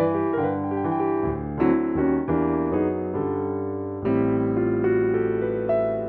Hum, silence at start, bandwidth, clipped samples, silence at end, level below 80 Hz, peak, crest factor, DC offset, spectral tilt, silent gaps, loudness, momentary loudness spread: none; 0 s; 4.1 kHz; under 0.1%; 0 s; -46 dBFS; -8 dBFS; 14 dB; under 0.1%; -12.5 dB/octave; none; -24 LUFS; 5 LU